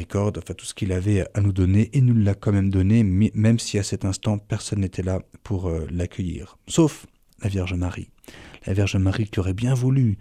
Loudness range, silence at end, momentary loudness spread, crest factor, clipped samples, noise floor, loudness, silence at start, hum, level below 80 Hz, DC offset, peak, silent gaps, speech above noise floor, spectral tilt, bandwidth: 6 LU; 0 s; 12 LU; 14 dB; under 0.1%; -44 dBFS; -23 LUFS; 0 s; none; -44 dBFS; under 0.1%; -8 dBFS; none; 23 dB; -6.5 dB/octave; 11.5 kHz